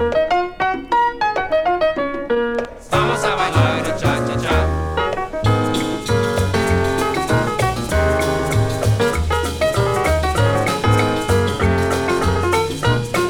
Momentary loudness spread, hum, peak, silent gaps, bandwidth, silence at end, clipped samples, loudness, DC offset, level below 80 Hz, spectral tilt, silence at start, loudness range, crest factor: 4 LU; none; -2 dBFS; none; 17.5 kHz; 0 s; under 0.1%; -18 LUFS; under 0.1%; -30 dBFS; -5.5 dB/octave; 0 s; 1 LU; 16 dB